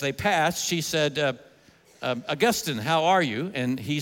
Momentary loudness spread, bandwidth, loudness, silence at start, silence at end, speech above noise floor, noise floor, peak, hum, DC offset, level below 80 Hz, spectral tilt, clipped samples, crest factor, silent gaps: 8 LU; 17 kHz; -25 LUFS; 0 s; 0 s; 31 dB; -56 dBFS; -10 dBFS; none; under 0.1%; -62 dBFS; -4 dB/octave; under 0.1%; 16 dB; none